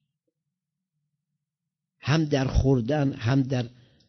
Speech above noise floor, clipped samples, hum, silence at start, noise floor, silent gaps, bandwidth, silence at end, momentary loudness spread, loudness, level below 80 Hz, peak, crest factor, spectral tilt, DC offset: 63 dB; under 0.1%; none; 2.05 s; -86 dBFS; none; 6.4 kHz; 0.4 s; 8 LU; -25 LUFS; -40 dBFS; -10 dBFS; 18 dB; -6.5 dB/octave; under 0.1%